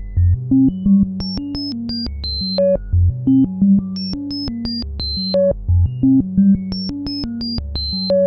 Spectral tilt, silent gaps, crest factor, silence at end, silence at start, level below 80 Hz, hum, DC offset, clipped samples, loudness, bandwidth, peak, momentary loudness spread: -9.5 dB/octave; none; 12 dB; 0 s; 0 s; -30 dBFS; none; under 0.1%; under 0.1%; -18 LUFS; 6 kHz; -6 dBFS; 9 LU